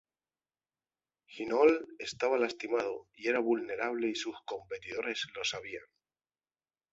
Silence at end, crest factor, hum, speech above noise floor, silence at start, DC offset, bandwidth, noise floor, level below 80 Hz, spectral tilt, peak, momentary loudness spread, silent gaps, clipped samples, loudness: 1.1 s; 22 dB; none; over 57 dB; 1.3 s; under 0.1%; 8 kHz; under -90 dBFS; -74 dBFS; -3 dB/octave; -12 dBFS; 15 LU; none; under 0.1%; -33 LUFS